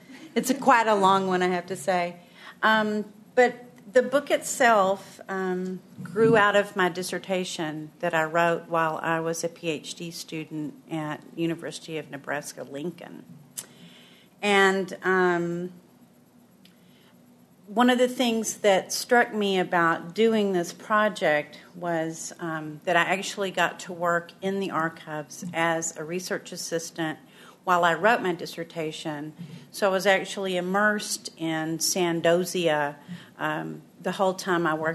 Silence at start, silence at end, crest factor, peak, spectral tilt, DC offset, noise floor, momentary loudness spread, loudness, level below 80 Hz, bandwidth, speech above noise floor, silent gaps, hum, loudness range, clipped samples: 0.1 s; 0 s; 20 dB; -6 dBFS; -4 dB/octave; under 0.1%; -56 dBFS; 14 LU; -25 LUFS; -76 dBFS; 13.5 kHz; 31 dB; none; none; 6 LU; under 0.1%